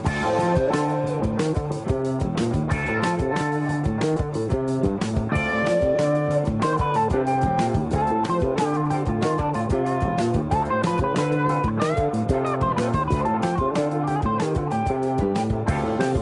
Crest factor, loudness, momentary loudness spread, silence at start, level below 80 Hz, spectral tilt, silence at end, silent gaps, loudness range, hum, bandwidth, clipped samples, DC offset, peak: 14 dB; -23 LUFS; 3 LU; 0 s; -38 dBFS; -7 dB/octave; 0 s; none; 2 LU; none; 11 kHz; under 0.1%; under 0.1%; -8 dBFS